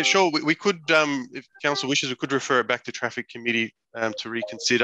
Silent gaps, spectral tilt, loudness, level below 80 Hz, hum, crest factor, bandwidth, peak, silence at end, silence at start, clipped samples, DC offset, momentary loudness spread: none; -3 dB/octave; -24 LUFS; -72 dBFS; none; 20 dB; 9.4 kHz; -4 dBFS; 0 s; 0 s; under 0.1%; under 0.1%; 10 LU